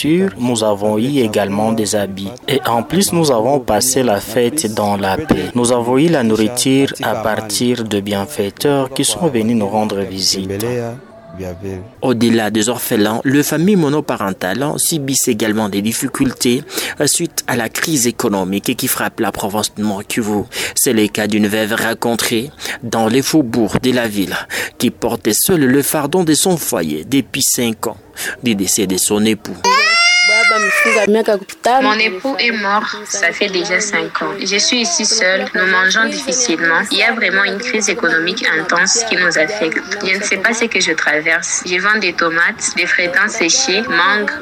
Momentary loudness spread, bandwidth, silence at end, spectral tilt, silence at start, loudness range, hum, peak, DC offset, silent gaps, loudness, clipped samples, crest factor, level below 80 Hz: 7 LU; 19.5 kHz; 0 s; -3 dB/octave; 0 s; 5 LU; none; -2 dBFS; under 0.1%; none; -14 LUFS; under 0.1%; 12 dB; -48 dBFS